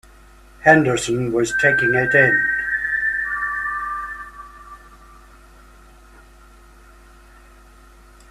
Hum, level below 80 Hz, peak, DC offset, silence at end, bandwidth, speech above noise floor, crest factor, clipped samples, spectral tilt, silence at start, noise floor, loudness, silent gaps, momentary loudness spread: none; -46 dBFS; 0 dBFS; under 0.1%; 3.55 s; 14.5 kHz; 30 dB; 22 dB; under 0.1%; -5 dB/octave; 0.6 s; -46 dBFS; -17 LUFS; none; 17 LU